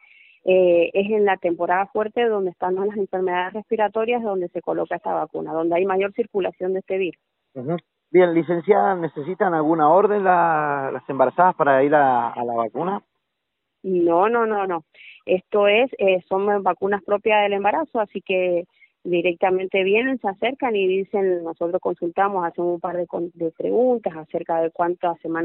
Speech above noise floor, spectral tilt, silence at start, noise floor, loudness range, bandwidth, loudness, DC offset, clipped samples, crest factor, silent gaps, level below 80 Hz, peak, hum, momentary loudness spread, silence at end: 58 dB; -4 dB/octave; 0.45 s; -78 dBFS; 5 LU; 4 kHz; -21 LUFS; under 0.1%; under 0.1%; 18 dB; none; -68 dBFS; -4 dBFS; none; 10 LU; 0 s